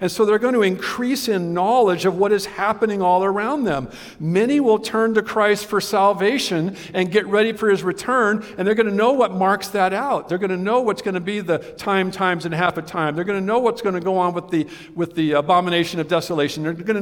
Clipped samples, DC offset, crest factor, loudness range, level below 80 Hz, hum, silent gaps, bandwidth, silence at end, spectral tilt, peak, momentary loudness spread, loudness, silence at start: under 0.1%; under 0.1%; 16 dB; 3 LU; -58 dBFS; none; none; 18 kHz; 0 s; -5.5 dB/octave; -2 dBFS; 7 LU; -20 LUFS; 0 s